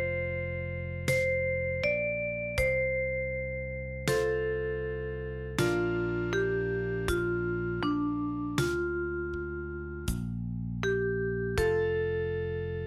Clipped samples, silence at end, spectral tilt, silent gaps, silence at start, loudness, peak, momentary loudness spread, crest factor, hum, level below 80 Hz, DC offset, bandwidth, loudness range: under 0.1%; 0 s; -6 dB/octave; none; 0 s; -31 LUFS; -12 dBFS; 7 LU; 18 dB; none; -44 dBFS; under 0.1%; 16 kHz; 3 LU